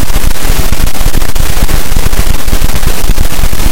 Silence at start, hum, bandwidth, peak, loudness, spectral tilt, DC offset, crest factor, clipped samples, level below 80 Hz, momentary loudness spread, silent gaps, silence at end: 0 s; none; 16.5 kHz; 0 dBFS; -14 LUFS; -4 dB/octave; under 0.1%; 2 dB; 8%; -8 dBFS; 1 LU; none; 0 s